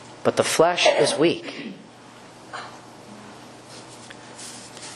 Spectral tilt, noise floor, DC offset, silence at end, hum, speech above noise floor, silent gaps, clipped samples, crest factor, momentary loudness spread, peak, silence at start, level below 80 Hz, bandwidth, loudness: -3 dB/octave; -45 dBFS; under 0.1%; 0 s; none; 25 dB; none; under 0.1%; 24 dB; 25 LU; -2 dBFS; 0 s; -66 dBFS; 12.5 kHz; -20 LUFS